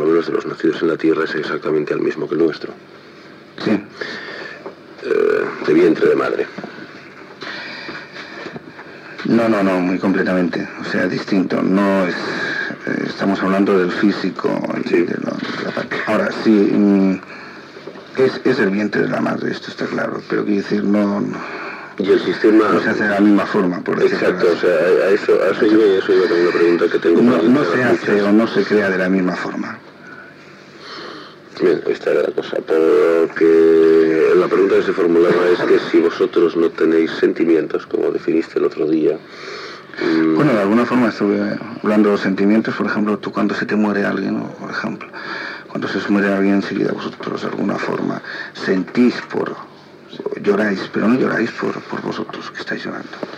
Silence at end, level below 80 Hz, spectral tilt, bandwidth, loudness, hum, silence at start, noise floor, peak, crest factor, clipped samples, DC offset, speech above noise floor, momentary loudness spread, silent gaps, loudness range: 0 s; -68 dBFS; -7 dB/octave; 9.6 kHz; -17 LUFS; none; 0 s; -40 dBFS; -2 dBFS; 14 dB; under 0.1%; under 0.1%; 24 dB; 16 LU; none; 7 LU